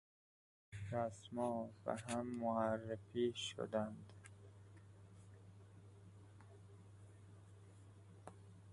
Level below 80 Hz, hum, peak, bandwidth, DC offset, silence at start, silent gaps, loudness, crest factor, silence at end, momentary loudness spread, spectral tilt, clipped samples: -72 dBFS; none; -24 dBFS; 11.5 kHz; under 0.1%; 0.7 s; none; -43 LUFS; 24 dB; 0 s; 21 LU; -5.5 dB/octave; under 0.1%